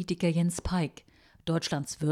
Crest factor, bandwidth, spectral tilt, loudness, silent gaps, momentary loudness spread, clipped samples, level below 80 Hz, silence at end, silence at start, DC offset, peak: 14 dB; 13.5 kHz; -5.5 dB/octave; -31 LUFS; none; 7 LU; under 0.1%; -50 dBFS; 0 s; 0 s; under 0.1%; -16 dBFS